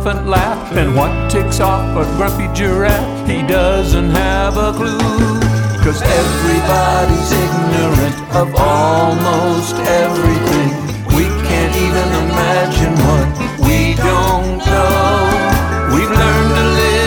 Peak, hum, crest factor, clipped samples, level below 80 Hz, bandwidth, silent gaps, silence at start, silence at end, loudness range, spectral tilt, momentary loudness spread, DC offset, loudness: 0 dBFS; none; 12 dB; under 0.1%; -20 dBFS; over 20 kHz; none; 0 s; 0 s; 1 LU; -5.5 dB/octave; 4 LU; under 0.1%; -13 LUFS